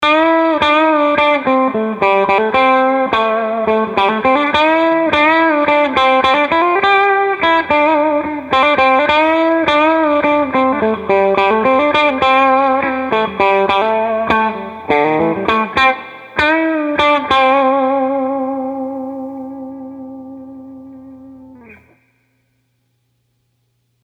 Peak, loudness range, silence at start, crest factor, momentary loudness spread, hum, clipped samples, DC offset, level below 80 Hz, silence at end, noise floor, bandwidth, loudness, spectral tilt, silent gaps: 0 dBFS; 7 LU; 0 s; 14 dB; 11 LU; none; under 0.1%; under 0.1%; -48 dBFS; 2.3 s; -64 dBFS; 9.4 kHz; -13 LUFS; -5.5 dB/octave; none